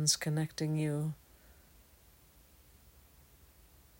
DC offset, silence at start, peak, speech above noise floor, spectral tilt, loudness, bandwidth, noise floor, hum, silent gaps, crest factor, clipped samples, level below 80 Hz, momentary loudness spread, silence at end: under 0.1%; 0 s; -14 dBFS; 29 dB; -4 dB/octave; -34 LUFS; 16 kHz; -62 dBFS; none; none; 24 dB; under 0.1%; -66 dBFS; 10 LU; 2.45 s